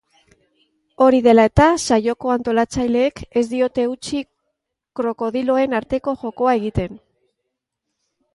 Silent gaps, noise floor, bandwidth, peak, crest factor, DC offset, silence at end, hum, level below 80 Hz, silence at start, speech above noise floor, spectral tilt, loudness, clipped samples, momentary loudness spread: none; -78 dBFS; 11.5 kHz; 0 dBFS; 18 dB; under 0.1%; 1.4 s; none; -40 dBFS; 1 s; 61 dB; -5.5 dB/octave; -18 LUFS; under 0.1%; 13 LU